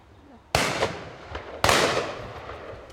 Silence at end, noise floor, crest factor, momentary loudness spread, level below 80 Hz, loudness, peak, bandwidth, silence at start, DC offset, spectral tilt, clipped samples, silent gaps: 0 s; -51 dBFS; 26 dB; 18 LU; -46 dBFS; -24 LUFS; -2 dBFS; 16.5 kHz; 0.3 s; under 0.1%; -3 dB/octave; under 0.1%; none